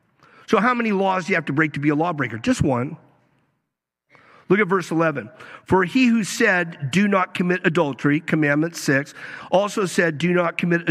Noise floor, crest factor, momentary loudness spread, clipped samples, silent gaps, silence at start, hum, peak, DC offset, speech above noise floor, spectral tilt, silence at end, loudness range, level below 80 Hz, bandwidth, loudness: -80 dBFS; 18 dB; 5 LU; under 0.1%; none; 0.5 s; none; -4 dBFS; under 0.1%; 60 dB; -5.5 dB/octave; 0 s; 4 LU; -52 dBFS; 14.5 kHz; -20 LUFS